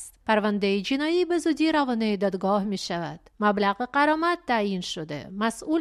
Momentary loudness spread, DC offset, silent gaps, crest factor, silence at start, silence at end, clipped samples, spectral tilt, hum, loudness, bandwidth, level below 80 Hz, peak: 8 LU; under 0.1%; none; 18 dB; 0 s; 0 s; under 0.1%; -5 dB/octave; none; -25 LUFS; 13 kHz; -60 dBFS; -8 dBFS